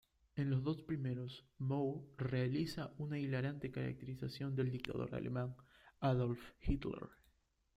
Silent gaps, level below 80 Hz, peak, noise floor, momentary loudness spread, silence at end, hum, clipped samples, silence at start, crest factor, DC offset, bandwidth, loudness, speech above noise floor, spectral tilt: none; -56 dBFS; -20 dBFS; -77 dBFS; 8 LU; 0.6 s; none; under 0.1%; 0.35 s; 20 dB; under 0.1%; 11.5 kHz; -42 LUFS; 36 dB; -8 dB/octave